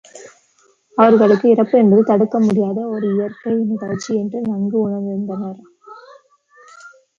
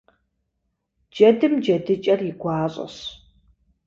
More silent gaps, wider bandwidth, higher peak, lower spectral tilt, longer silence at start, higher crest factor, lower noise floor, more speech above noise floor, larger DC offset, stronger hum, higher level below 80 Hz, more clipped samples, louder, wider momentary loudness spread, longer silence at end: neither; about the same, 7.6 kHz vs 7.4 kHz; about the same, -2 dBFS vs -4 dBFS; about the same, -8 dB/octave vs -7 dB/octave; second, 0.15 s vs 1.15 s; about the same, 16 dB vs 20 dB; second, -57 dBFS vs -75 dBFS; second, 42 dB vs 56 dB; neither; neither; about the same, -62 dBFS vs -60 dBFS; neither; first, -16 LUFS vs -20 LUFS; second, 11 LU vs 18 LU; second, 0.3 s vs 0.7 s